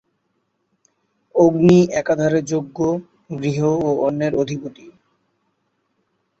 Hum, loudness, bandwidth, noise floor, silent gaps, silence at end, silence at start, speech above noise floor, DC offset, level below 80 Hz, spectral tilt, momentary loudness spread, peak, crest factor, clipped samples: none; -18 LUFS; 8 kHz; -70 dBFS; none; 1.5 s; 1.35 s; 53 dB; under 0.1%; -54 dBFS; -7 dB/octave; 13 LU; -2 dBFS; 18 dB; under 0.1%